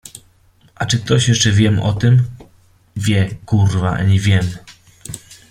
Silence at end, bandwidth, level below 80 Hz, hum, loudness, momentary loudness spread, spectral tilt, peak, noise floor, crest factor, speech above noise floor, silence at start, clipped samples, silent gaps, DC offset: 0.15 s; 13 kHz; -42 dBFS; none; -16 LUFS; 19 LU; -5 dB/octave; -2 dBFS; -52 dBFS; 16 dB; 38 dB; 0.05 s; under 0.1%; none; under 0.1%